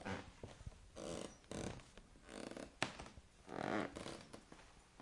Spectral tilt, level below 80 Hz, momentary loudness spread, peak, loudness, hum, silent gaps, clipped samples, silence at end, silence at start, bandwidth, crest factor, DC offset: -4.5 dB/octave; -64 dBFS; 18 LU; -18 dBFS; -49 LUFS; none; none; under 0.1%; 0 s; 0 s; 11.5 kHz; 30 dB; under 0.1%